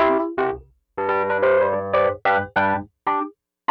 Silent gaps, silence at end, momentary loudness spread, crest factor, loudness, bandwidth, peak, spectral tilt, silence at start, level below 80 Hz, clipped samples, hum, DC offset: none; 0.4 s; 10 LU; 16 dB; -21 LUFS; 5.6 kHz; -6 dBFS; -8 dB/octave; 0 s; -54 dBFS; under 0.1%; none; under 0.1%